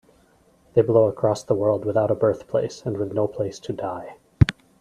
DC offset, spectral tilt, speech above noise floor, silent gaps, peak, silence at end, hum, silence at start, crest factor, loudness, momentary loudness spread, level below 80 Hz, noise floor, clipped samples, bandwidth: under 0.1%; -7.5 dB/octave; 36 dB; none; 0 dBFS; 0.3 s; none; 0.75 s; 22 dB; -23 LUFS; 11 LU; -42 dBFS; -58 dBFS; under 0.1%; 11.5 kHz